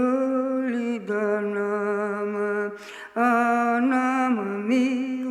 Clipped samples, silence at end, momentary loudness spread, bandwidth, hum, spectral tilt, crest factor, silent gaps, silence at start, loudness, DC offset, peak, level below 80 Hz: under 0.1%; 0 s; 6 LU; 12 kHz; none; -6 dB/octave; 14 dB; none; 0 s; -24 LUFS; under 0.1%; -10 dBFS; -74 dBFS